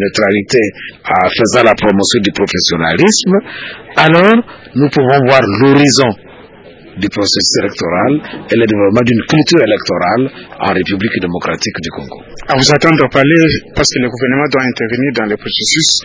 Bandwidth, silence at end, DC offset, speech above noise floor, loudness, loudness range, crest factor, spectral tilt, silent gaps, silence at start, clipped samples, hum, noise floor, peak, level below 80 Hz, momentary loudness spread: 8 kHz; 0 s; under 0.1%; 25 dB; -11 LUFS; 3 LU; 12 dB; -4 dB/octave; none; 0 s; 0.2%; none; -36 dBFS; 0 dBFS; -38 dBFS; 10 LU